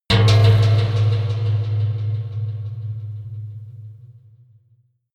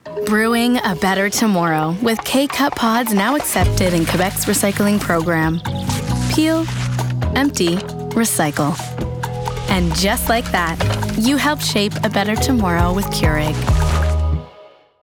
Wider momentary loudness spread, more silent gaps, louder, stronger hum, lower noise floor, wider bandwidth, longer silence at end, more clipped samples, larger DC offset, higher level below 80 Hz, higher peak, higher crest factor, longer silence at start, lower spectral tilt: first, 22 LU vs 5 LU; neither; about the same, -19 LUFS vs -17 LUFS; neither; first, -59 dBFS vs -44 dBFS; second, 8.8 kHz vs over 20 kHz; first, 1.05 s vs 0.35 s; neither; neither; second, -44 dBFS vs -28 dBFS; about the same, -4 dBFS vs -2 dBFS; about the same, 16 dB vs 14 dB; about the same, 0.1 s vs 0.05 s; first, -6.5 dB/octave vs -4.5 dB/octave